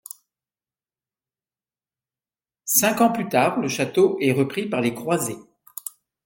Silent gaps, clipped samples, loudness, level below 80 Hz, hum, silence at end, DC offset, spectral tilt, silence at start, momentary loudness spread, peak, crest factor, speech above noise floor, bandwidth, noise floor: none; under 0.1%; -21 LUFS; -68 dBFS; none; 0.35 s; under 0.1%; -4 dB/octave; 2.65 s; 19 LU; -2 dBFS; 22 dB; over 69 dB; 17 kHz; under -90 dBFS